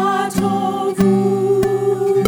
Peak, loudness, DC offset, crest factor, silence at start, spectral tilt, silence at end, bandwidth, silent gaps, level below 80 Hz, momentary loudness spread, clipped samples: 0 dBFS; -17 LUFS; under 0.1%; 16 dB; 0 s; -6.5 dB/octave; 0 s; over 20 kHz; none; -46 dBFS; 4 LU; under 0.1%